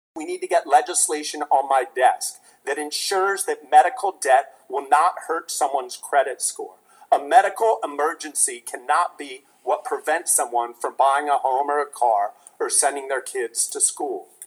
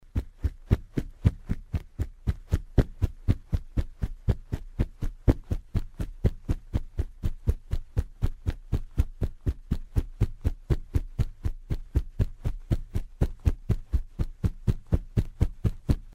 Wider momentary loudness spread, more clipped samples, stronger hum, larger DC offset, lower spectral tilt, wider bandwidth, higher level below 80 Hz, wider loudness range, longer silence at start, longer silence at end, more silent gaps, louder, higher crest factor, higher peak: first, 12 LU vs 7 LU; neither; neither; neither; second, 1 dB/octave vs -8.5 dB/octave; first, 19.5 kHz vs 14.5 kHz; second, -90 dBFS vs -30 dBFS; about the same, 2 LU vs 2 LU; about the same, 0.15 s vs 0.15 s; about the same, 0 s vs 0 s; neither; first, -21 LUFS vs -32 LUFS; about the same, 20 dB vs 22 dB; first, -2 dBFS vs -6 dBFS